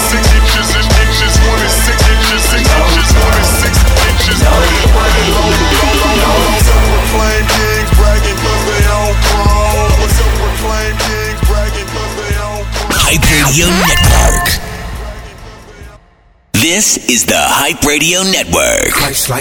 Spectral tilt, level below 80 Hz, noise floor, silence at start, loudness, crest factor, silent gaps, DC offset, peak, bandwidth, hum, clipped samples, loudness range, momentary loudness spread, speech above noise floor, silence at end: -3.5 dB/octave; -14 dBFS; -46 dBFS; 0 s; -10 LUFS; 10 dB; none; under 0.1%; 0 dBFS; 19 kHz; none; under 0.1%; 4 LU; 7 LU; 35 dB; 0 s